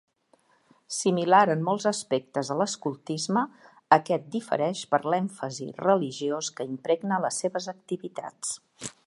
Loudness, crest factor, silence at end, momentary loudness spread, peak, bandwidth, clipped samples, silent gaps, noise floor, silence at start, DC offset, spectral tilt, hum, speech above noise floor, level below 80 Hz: -27 LUFS; 24 dB; 0.15 s; 12 LU; -4 dBFS; 11.5 kHz; under 0.1%; none; -65 dBFS; 0.9 s; under 0.1%; -4.5 dB/octave; none; 39 dB; -78 dBFS